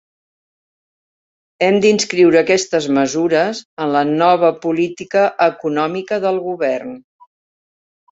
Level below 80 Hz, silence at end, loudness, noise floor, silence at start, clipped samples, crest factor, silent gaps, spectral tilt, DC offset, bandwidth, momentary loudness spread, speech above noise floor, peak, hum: -62 dBFS; 1.1 s; -16 LUFS; under -90 dBFS; 1.6 s; under 0.1%; 16 dB; 3.65-3.77 s; -4.5 dB/octave; under 0.1%; 8 kHz; 7 LU; over 75 dB; -2 dBFS; none